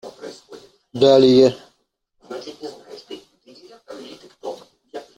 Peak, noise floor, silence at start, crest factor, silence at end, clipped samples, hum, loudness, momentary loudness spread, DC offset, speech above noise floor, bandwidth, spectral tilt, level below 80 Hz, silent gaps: -2 dBFS; -68 dBFS; 0.05 s; 18 dB; 0.15 s; under 0.1%; none; -14 LUFS; 27 LU; under 0.1%; 53 dB; 9.2 kHz; -6 dB/octave; -60 dBFS; none